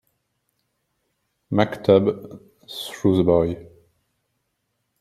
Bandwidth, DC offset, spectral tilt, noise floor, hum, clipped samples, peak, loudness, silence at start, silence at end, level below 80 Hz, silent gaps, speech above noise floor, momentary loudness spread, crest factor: 14 kHz; under 0.1%; -7 dB/octave; -75 dBFS; none; under 0.1%; -2 dBFS; -20 LUFS; 1.5 s; 1.4 s; -54 dBFS; none; 55 dB; 18 LU; 22 dB